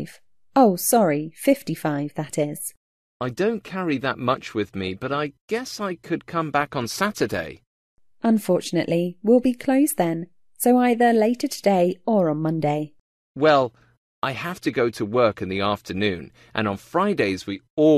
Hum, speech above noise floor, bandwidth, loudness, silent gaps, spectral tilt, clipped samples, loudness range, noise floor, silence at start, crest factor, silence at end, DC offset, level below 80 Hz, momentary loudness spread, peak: none; 29 dB; 14 kHz; -23 LUFS; 2.77-3.20 s, 5.41-5.48 s, 7.67-7.97 s, 13.01-13.35 s, 13.97-14.22 s, 17.70-17.77 s; -5.5 dB/octave; under 0.1%; 6 LU; -51 dBFS; 0 s; 18 dB; 0 s; under 0.1%; -60 dBFS; 11 LU; -4 dBFS